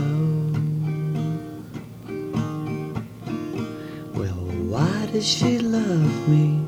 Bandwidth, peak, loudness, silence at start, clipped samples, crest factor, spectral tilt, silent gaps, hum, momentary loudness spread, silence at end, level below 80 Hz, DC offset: 10 kHz; -6 dBFS; -24 LUFS; 0 s; under 0.1%; 16 dB; -6 dB/octave; none; none; 13 LU; 0 s; -50 dBFS; under 0.1%